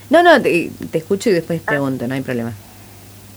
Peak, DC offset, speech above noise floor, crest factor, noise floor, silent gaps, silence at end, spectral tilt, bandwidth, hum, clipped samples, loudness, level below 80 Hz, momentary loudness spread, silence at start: 0 dBFS; under 0.1%; 24 dB; 16 dB; -39 dBFS; none; 0 s; -5.5 dB/octave; over 20 kHz; none; under 0.1%; -16 LUFS; -54 dBFS; 14 LU; 0 s